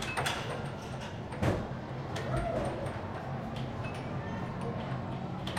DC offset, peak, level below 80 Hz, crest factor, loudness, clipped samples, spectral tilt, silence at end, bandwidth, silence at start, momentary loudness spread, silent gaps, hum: under 0.1%; -16 dBFS; -50 dBFS; 20 dB; -36 LUFS; under 0.1%; -5.5 dB/octave; 0 s; 16 kHz; 0 s; 7 LU; none; none